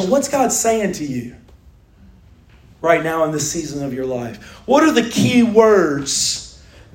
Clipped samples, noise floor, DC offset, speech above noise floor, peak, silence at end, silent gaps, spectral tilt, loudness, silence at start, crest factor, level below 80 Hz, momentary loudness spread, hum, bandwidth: under 0.1%; -47 dBFS; under 0.1%; 30 dB; 0 dBFS; 0.45 s; none; -4 dB/octave; -17 LUFS; 0 s; 18 dB; -48 dBFS; 14 LU; none; 16.5 kHz